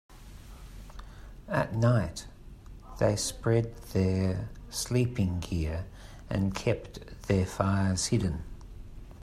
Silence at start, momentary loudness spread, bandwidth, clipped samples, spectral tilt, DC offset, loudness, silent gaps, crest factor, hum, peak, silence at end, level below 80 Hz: 0.1 s; 22 LU; 14.5 kHz; under 0.1%; -5.5 dB/octave; under 0.1%; -30 LUFS; none; 20 dB; none; -10 dBFS; 0 s; -46 dBFS